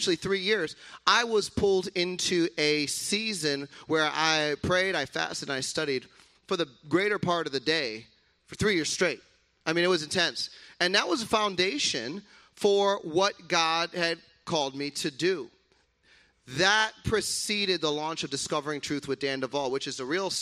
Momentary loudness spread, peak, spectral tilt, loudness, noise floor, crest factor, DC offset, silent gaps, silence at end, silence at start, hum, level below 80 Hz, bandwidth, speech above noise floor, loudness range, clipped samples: 8 LU; -6 dBFS; -3 dB/octave; -27 LUFS; -67 dBFS; 22 dB; under 0.1%; none; 0 s; 0 s; none; -58 dBFS; 15 kHz; 39 dB; 3 LU; under 0.1%